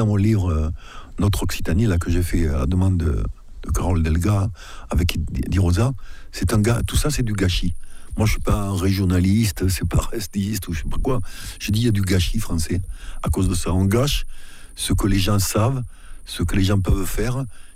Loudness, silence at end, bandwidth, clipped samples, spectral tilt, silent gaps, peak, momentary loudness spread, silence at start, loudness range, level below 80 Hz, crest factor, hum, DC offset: -22 LUFS; 0.05 s; 16 kHz; under 0.1%; -5.5 dB/octave; none; -6 dBFS; 11 LU; 0 s; 1 LU; -28 dBFS; 14 dB; none; under 0.1%